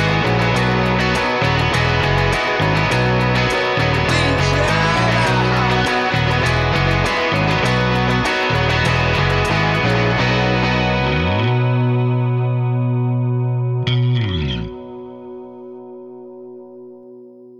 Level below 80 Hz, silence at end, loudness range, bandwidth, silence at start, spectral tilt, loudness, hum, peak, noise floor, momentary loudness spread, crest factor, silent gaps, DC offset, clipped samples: -32 dBFS; 0.05 s; 6 LU; 12 kHz; 0 s; -6 dB/octave; -16 LUFS; 60 Hz at -50 dBFS; -4 dBFS; -40 dBFS; 18 LU; 14 dB; none; under 0.1%; under 0.1%